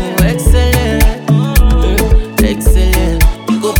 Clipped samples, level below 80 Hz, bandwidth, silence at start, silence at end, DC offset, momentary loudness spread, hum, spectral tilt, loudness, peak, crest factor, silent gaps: under 0.1%; -12 dBFS; 19.5 kHz; 0 s; 0 s; under 0.1%; 3 LU; none; -5.5 dB/octave; -12 LUFS; 0 dBFS; 10 dB; none